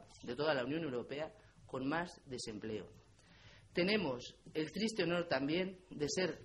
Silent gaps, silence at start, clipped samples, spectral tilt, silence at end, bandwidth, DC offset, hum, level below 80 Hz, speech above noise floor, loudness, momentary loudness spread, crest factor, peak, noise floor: none; 0 s; under 0.1%; -4.5 dB/octave; 0 s; 11.5 kHz; under 0.1%; none; -68 dBFS; 24 dB; -39 LUFS; 11 LU; 20 dB; -20 dBFS; -62 dBFS